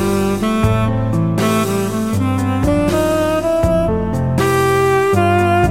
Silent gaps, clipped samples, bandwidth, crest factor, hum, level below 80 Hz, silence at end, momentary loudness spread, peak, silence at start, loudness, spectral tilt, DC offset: none; under 0.1%; 16.5 kHz; 14 dB; none; -30 dBFS; 0 s; 4 LU; -2 dBFS; 0 s; -15 LUFS; -6.5 dB/octave; under 0.1%